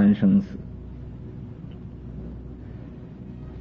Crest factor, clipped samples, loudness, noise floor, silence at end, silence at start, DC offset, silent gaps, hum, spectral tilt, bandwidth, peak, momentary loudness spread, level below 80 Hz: 18 dB; under 0.1%; -25 LUFS; -39 dBFS; 0 s; 0 s; under 0.1%; none; none; -10.5 dB/octave; 4 kHz; -10 dBFS; 19 LU; -44 dBFS